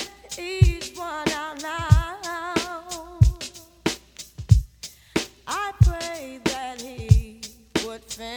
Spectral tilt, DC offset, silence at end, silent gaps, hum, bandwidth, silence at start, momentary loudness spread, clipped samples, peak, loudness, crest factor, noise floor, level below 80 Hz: -5.5 dB/octave; under 0.1%; 0 s; none; none; 19.5 kHz; 0 s; 15 LU; under 0.1%; -2 dBFS; -24 LUFS; 22 dB; -44 dBFS; -30 dBFS